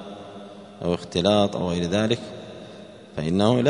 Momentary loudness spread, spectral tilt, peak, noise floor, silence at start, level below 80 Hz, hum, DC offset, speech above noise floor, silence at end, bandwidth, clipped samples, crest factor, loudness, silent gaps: 21 LU; -6 dB/octave; -4 dBFS; -43 dBFS; 0 s; -52 dBFS; none; under 0.1%; 21 dB; 0 s; 10.5 kHz; under 0.1%; 20 dB; -23 LUFS; none